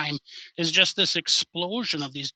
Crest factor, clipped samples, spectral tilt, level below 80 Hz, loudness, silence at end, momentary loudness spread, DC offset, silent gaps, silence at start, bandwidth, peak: 24 dB; under 0.1%; -2 dB/octave; -72 dBFS; -23 LUFS; 0.05 s; 11 LU; under 0.1%; none; 0 s; 9.4 kHz; -2 dBFS